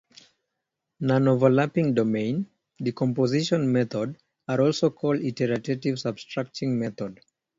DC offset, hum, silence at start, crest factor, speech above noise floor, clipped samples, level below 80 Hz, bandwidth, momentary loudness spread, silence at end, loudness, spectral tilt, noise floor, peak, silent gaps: under 0.1%; none; 1 s; 20 dB; 59 dB; under 0.1%; -64 dBFS; 7.8 kHz; 11 LU; 0.45 s; -25 LUFS; -7 dB/octave; -83 dBFS; -6 dBFS; none